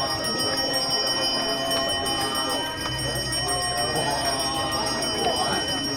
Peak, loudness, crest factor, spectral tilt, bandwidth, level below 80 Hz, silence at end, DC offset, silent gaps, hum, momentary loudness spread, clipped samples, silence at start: -12 dBFS; -23 LUFS; 14 dB; -2.5 dB/octave; 17 kHz; -46 dBFS; 0 s; under 0.1%; none; none; 3 LU; under 0.1%; 0 s